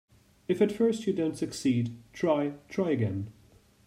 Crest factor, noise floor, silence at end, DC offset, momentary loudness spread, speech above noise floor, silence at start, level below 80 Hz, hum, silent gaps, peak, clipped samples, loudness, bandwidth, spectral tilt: 18 dB; -60 dBFS; 0.55 s; under 0.1%; 10 LU; 31 dB; 0.5 s; -64 dBFS; none; none; -12 dBFS; under 0.1%; -29 LUFS; 15.5 kHz; -7 dB/octave